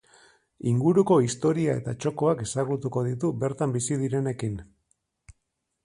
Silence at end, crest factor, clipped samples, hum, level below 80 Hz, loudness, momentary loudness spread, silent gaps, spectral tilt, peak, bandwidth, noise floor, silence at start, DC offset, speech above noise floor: 0.55 s; 18 dB; under 0.1%; none; -58 dBFS; -26 LUFS; 9 LU; none; -6.5 dB/octave; -8 dBFS; 11.5 kHz; -79 dBFS; 0.65 s; under 0.1%; 54 dB